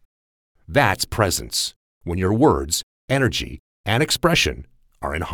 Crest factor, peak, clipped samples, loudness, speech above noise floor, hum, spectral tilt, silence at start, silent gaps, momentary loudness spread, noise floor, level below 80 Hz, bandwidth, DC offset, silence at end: 18 dB; -4 dBFS; under 0.1%; -20 LUFS; over 70 dB; none; -4 dB/octave; 0.7 s; 1.76-2.01 s, 2.83-3.08 s, 3.59-3.84 s; 13 LU; under -90 dBFS; -38 dBFS; 19.5 kHz; under 0.1%; 0 s